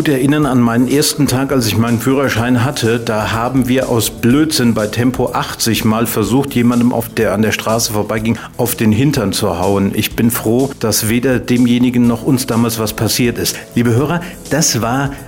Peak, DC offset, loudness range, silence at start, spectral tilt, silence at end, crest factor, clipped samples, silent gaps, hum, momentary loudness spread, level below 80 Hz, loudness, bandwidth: -2 dBFS; 0.1%; 1 LU; 0 s; -5 dB/octave; 0 s; 10 dB; under 0.1%; none; none; 4 LU; -38 dBFS; -14 LUFS; 16.5 kHz